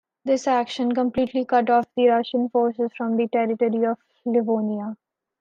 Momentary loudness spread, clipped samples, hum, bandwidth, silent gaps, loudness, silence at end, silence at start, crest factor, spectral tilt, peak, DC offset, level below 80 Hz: 7 LU; under 0.1%; none; 7.6 kHz; none; -22 LUFS; 0.45 s; 0.25 s; 14 dB; -6 dB/octave; -8 dBFS; under 0.1%; -62 dBFS